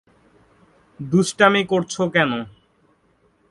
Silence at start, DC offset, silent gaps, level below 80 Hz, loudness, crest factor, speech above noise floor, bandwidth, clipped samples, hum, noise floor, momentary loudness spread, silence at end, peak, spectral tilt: 1 s; under 0.1%; none; -60 dBFS; -19 LUFS; 22 dB; 42 dB; 11.5 kHz; under 0.1%; none; -61 dBFS; 16 LU; 1 s; 0 dBFS; -5 dB/octave